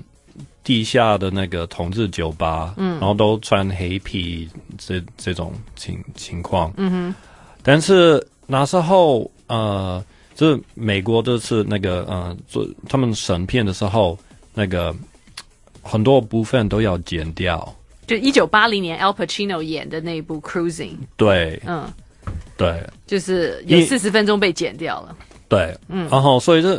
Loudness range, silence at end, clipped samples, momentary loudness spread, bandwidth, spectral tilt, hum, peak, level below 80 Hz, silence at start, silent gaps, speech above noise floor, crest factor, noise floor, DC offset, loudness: 6 LU; 0 s; under 0.1%; 17 LU; 12 kHz; -5.5 dB/octave; none; 0 dBFS; -42 dBFS; 0.4 s; none; 24 dB; 18 dB; -42 dBFS; under 0.1%; -19 LUFS